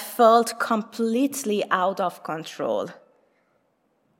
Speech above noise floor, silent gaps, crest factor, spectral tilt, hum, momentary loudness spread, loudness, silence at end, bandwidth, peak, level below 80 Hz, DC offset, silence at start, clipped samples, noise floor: 46 dB; none; 20 dB; -4 dB/octave; none; 13 LU; -23 LUFS; 1.25 s; 16.5 kHz; -4 dBFS; -88 dBFS; under 0.1%; 0 s; under 0.1%; -68 dBFS